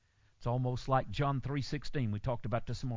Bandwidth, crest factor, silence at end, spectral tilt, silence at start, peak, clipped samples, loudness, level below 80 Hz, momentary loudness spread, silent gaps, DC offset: 7.6 kHz; 18 dB; 0 s; -7 dB/octave; 0.4 s; -16 dBFS; under 0.1%; -35 LUFS; -50 dBFS; 5 LU; none; under 0.1%